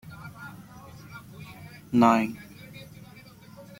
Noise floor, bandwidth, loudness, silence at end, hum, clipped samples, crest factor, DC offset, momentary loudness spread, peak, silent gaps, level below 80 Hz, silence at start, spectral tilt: -49 dBFS; 16.5 kHz; -23 LUFS; 0.15 s; none; under 0.1%; 24 dB; under 0.1%; 27 LU; -6 dBFS; none; -62 dBFS; 0.1 s; -6.5 dB/octave